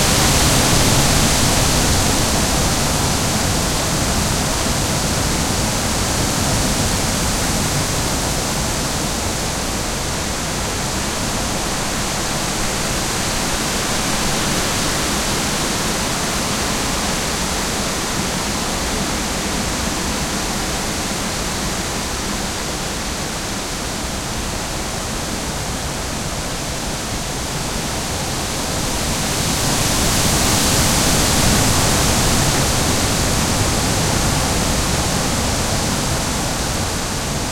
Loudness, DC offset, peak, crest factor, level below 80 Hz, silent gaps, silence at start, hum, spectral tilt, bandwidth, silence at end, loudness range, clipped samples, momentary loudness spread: -18 LUFS; under 0.1%; -2 dBFS; 18 dB; -28 dBFS; none; 0 s; none; -3 dB/octave; 16.5 kHz; 0 s; 7 LU; under 0.1%; 8 LU